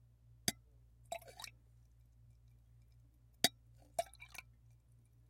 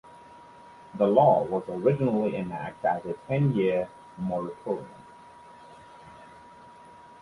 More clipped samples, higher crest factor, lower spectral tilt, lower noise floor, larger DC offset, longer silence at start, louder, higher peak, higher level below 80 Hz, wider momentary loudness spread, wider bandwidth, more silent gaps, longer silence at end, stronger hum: neither; first, 38 dB vs 22 dB; second, -1.5 dB/octave vs -9 dB/octave; first, -67 dBFS vs -50 dBFS; neither; first, 0.45 s vs 0.05 s; second, -42 LUFS vs -27 LUFS; second, -10 dBFS vs -6 dBFS; second, -68 dBFS vs -62 dBFS; second, 17 LU vs 20 LU; first, 16 kHz vs 11 kHz; neither; first, 0.9 s vs 0.15 s; neither